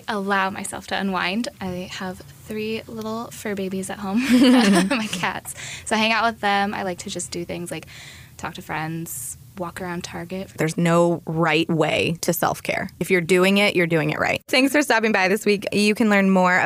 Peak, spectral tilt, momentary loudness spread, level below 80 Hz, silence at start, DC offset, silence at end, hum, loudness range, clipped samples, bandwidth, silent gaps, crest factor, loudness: -6 dBFS; -4.5 dB/octave; 15 LU; -56 dBFS; 0.1 s; under 0.1%; 0 s; none; 9 LU; under 0.1%; 16 kHz; none; 16 dB; -21 LUFS